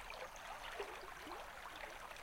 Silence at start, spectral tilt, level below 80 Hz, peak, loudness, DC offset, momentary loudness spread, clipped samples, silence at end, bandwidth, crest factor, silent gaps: 0 s; -2 dB/octave; -64 dBFS; -32 dBFS; -50 LUFS; under 0.1%; 3 LU; under 0.1%; 0 s; 16.5 kHz; 18 dB; none